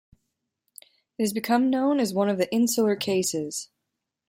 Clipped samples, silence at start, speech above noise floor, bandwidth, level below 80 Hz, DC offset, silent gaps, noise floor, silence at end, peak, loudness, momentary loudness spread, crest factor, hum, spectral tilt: under 0.1%; 1.2 s; 59 dB; 16.5 kHz; -70 dBFS; under 0.1%; none; -83 dBFS; 0.65 s; -10 dBFS; -24 LUFS; 11 LU; 16 dB; none; -4 dB/octave